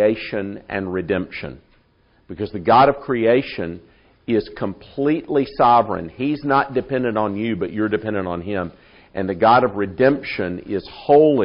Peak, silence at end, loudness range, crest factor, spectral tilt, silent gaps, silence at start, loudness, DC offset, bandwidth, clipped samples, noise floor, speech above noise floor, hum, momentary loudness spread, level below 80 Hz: -2 dBFS; 0 s; 2 LU; 16 dB; -5 dB/octave; none; 0 s; -20 LUFS; under 0.1%; 5.4 kHz; under 0.1%; -58 dBFS; 39 dB; none; 14 LU; -50 dBFS